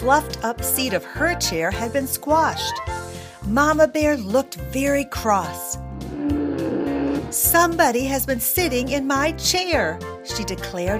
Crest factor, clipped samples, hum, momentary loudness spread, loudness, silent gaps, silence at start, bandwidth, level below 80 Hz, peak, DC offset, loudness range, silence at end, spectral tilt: 18 dB; under 0.1%; none; 11 LU; -21 LUFS; none; 0 s; 15.5 kHz; -38 dBFS; -4 dBFS; under 0.1%; 3 LU; 0 s; -3.5 dB/octave